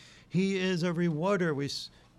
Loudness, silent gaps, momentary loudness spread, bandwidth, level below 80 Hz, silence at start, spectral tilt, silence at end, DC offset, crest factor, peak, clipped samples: -30 LUFS; none; 6 LU; 12 kHz; -66 dBFS; 0 s; -6 dB/octave; 0.3 s; under 0.1%; 12 dB; -18 dBFS; under 0.1%